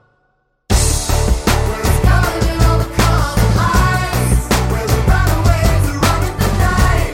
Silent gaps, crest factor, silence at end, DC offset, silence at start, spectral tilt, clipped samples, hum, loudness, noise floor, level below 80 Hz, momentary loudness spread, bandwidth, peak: none; 12 dB; 0 s; under 0.1%; 0.7 s; -5 dB/octave; under 0.1%; none; -15 LUFS; -62 dBFS; -18 dBFS; 3 LU; 17 kHz; 0 dBFS